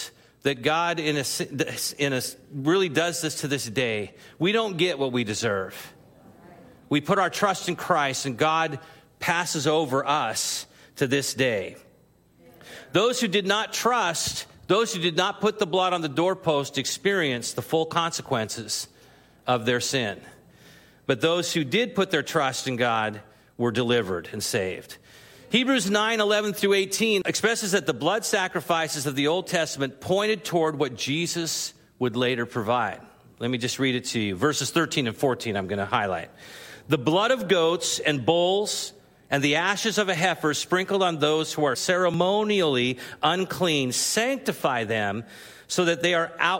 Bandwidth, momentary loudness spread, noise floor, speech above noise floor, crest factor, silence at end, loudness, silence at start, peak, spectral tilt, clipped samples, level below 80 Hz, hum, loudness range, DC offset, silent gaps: 16.5 kHz; 8 LU; -59 dBFS; 34 dB; 20 dB; 0 s; -24 LUFS; 0 s; -4 dBFS; -3.5 dB/octave; under 0.1%; -66 dBFS; none; 3 LU; under 0.1%; none